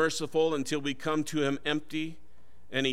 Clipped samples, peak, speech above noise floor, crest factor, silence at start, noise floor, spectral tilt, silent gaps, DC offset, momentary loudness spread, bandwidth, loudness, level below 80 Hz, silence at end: under 0.1%; -14 dBFS; 24 dB; 16 dB; 0 s; -54 dBFS; -4 dB/octave; none; 1%; 8 LU; 15.5 kHz; -31 LUFS; -64 dBFS; 0 s